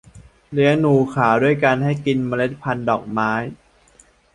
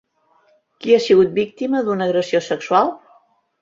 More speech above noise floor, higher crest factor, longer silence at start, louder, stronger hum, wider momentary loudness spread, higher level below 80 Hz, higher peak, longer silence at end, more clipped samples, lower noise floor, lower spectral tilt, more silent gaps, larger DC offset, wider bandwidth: second, 35 dB vs 42 dB; about the same, 18 dB vs 16 dB; second, 0.15 s vs 0.85 s; about the same, -19 LUFS vs -17 LUFS; neither; about the same, 8 LU vs 8 LU; first, -52 dBFS vs -62 dBFS; about the same, -2 dBFS vs -2 dBFS; first, 0.8 s vs 0.65 s; neither; second, -53 dBFS vs -59 dBFS; first, -7.5 dB/octave vs -5.5 dB/octave; neither; neither; first, 10.5 kHz vs 7.6 kHz